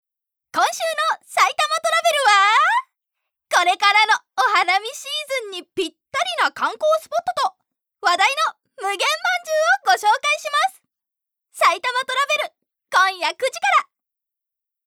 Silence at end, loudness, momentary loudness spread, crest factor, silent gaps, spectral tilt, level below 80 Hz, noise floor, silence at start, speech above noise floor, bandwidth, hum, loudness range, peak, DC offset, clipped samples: 1.05 s; -19 LUFS; 10 LU; 18 dB; none; 1 dB/octave; -76 dBFS; -86 dBFS; 0.55 s; 66 dB; 18.5 kHz; none; 4 LU; -2 dBFS; under 0.1%; under 0.1%